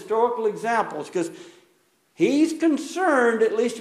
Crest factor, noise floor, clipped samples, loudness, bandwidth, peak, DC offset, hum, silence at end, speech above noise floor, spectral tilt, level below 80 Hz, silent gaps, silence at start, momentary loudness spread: 16 dB; -64 dBFS; under 0.1%; -22 LUFS; 13 kHz; -8 dBFS; under 0.1%; none; 0 s; 42 dB; -4.5 dB/octave; -76 dBFS; none; 0 s; 9 LU